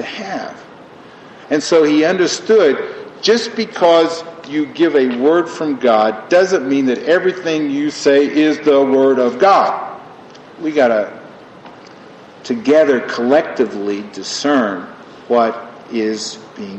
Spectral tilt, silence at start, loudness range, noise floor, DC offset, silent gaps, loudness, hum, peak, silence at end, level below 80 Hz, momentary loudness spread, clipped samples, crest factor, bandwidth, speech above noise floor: -4 dB/octave; 0 s; 4 LU; -38 dBFS; under 0.1%; none; -15 LUFS; none; 0 dBFS; 0 s; -64 dBFS; 13 LU; under 0.1%; 14 dB; 8.6 kHz; 25 dB